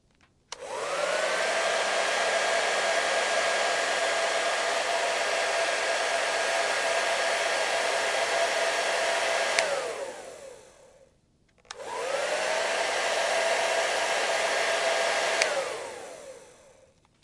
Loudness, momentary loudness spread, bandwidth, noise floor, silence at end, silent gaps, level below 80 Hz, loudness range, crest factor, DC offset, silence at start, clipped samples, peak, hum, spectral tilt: -26 LUFS; 12 LU; 11.5 kHz; -65 dBFS; 0.75 s; none; -70 dBFS; 5 LU; 26 dB; under 0.1%; 0.5 s; under 0.1%; -2 dBFS; none; 0.5 dB/octave